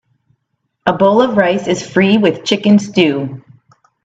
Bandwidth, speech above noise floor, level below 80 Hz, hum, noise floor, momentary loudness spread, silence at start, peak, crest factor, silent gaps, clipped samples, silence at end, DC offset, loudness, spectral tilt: 8 kHz; 57 dB; -56 dBFS; none; -69 dBFS; 8 LU; 0.85 s; 0 dBFS; 14 dB; none; under 0.1%; 0.65 s; under 0.1%; -13 LUFS; -5.5 dB/octave